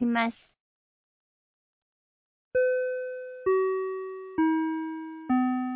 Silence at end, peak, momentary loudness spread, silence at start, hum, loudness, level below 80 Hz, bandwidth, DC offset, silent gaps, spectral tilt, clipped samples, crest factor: 0 s; -14 dBFS; 10 LU; 0 s; none; -29 LUFS; -68 dBFS; 4 kHz; under 0.1%; 0.60-2.51 s; -3.5 dB/octave; under 0.1%; 16 dB